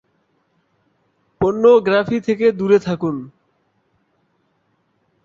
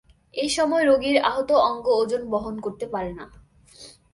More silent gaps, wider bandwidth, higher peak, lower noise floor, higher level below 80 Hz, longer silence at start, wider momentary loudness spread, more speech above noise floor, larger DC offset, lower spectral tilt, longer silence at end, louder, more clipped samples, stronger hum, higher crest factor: neither; second, 7.4 kHz vs 11.5 kHz; first, -2 dBFS vs -6 dBFS; first, -65 dBFS vs -48 dBFS; about the same, -54 dBFS vs -52 dBFS; first, 1.4 s vs 0.35 s; about the same, 10 LU vs 12 LU; first, 50 dB vs 26 dB; neither; first, -7.5 dB/octave vs -3.5 dB/octave; first, 1.95 s vs 0.25 s; first, -16 LUFS vs -22 LUFS; neither; neither; about the same, 18 dB vs 18 dB